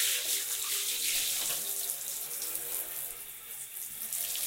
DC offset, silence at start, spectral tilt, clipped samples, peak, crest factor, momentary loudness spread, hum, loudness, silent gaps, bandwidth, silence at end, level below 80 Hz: under 0.1%; 0 s; 2.5 dB/octave; under 0.1%; -14 dBFS; 22 dB; 10 LU; none; -32 LUFS; none; 16.5 kHz; 0 s; -68 dBFS